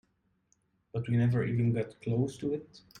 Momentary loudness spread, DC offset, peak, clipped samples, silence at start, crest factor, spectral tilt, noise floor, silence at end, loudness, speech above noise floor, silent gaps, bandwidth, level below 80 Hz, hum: 10 LU; under 0.1%; -18 dBFS; under 0.1%; 0.95 s; 14 dB; -8.5 dB/octave; -73 dBFS; 0.2 s; -32 LUFS; 43 dB; none; 9.6 kHz; -62 dBFS; none